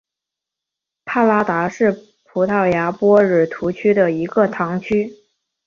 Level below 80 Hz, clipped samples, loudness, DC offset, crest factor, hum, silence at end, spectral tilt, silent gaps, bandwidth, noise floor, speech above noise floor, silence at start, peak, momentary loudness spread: -56 dBFS; under 0.1%; -17 LUFS; under 0.1%; 16 dB; none; 0.55 s; -8 dB/octave; none; 7.2 kHz; -85 dBFS; 68 dB; 1.05 s; -2 dBFS; 9 LU